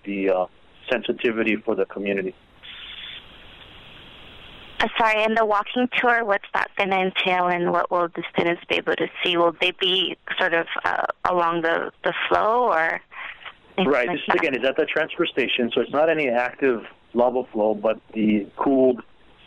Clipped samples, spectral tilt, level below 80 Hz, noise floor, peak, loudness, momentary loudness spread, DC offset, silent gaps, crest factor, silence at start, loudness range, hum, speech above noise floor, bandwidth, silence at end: under 0.1%; -5.5 dB/octave; -58 dBFS; -45 dBFS; 0 dBFS; -22 LUFS; 12 LU; under 0.1%; none; 22 dB; 0.05 s; 6 LU; none; 23 dB; 10 kHz; 0.45 s